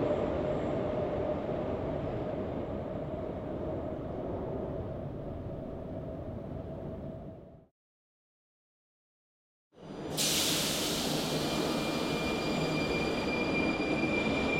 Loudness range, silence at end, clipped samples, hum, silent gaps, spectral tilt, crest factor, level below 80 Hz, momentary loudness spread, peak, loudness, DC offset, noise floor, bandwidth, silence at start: 14 LU; 0 s; under 0.1%; none; 7.71-9.71 s; -4 dB/octave; 16 dB; -52 dBFS; 11 LU; -18 dBFS; -33 LUFS; under 0.1%; under -90 dBFS; 16.5 kHz; 0 s